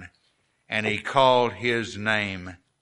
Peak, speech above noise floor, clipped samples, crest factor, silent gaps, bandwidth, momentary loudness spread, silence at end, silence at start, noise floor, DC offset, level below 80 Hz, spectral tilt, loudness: -6 dBFS; 45 dB; under 0.1%; 20 dB; none; 11 kHz; 11 LU; 0.25 s; 0 s; -69 dBFS; under 0.1%; -62 dBFS; -4.5 dB/octave; -23 LUFS